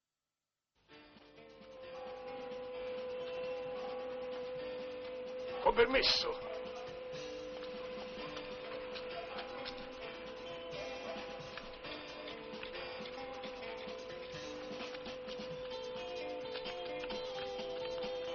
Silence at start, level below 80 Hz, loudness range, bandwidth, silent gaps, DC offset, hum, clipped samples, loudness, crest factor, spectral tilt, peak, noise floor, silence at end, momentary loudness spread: 0.9 s; -64 dBFS; 10 LU; 6.6 kHz; none; under 0.1%; none; under 0.1%; -41 LUFS; 24 dB; -1 dB/octave; -18 dBFS; under -90 dBFS; 0 s; 9 LU